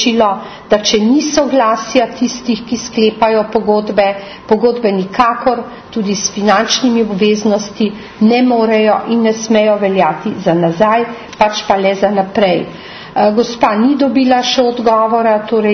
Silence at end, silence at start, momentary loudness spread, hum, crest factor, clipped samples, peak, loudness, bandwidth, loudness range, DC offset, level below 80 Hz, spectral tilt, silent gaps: 0 s; 0 s; 7 LU; none; 12 dB; under 0.1%; 0 dBFS; -13 LUFS; 6.6 kHz; 2 LU; under 0.1%; -48 dBFS; -4.5 dB/octave; none